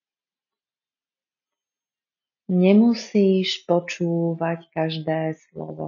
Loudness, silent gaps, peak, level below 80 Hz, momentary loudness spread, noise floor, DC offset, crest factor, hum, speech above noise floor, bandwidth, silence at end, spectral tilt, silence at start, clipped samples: -21 LUFS; none; -4 dBFS; -74 dBFS; 10 LU; under -90 dBFS; under 0.1%; 18 dB; none; over 69 dB; 7.4 kHz; 0 s; -6 dB/octave; 2.5 s; under 0.1%